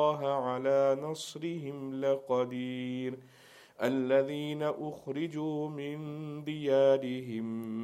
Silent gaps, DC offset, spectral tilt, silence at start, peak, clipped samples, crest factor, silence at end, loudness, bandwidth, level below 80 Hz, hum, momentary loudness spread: none; under 0.1%; -6.5 dB/octave; 0 s; -14 dBFS; under 0.1%; 18 dB; 0 s; -32 LUFS; 14 kHz; -80 dBFS; none; 12 LU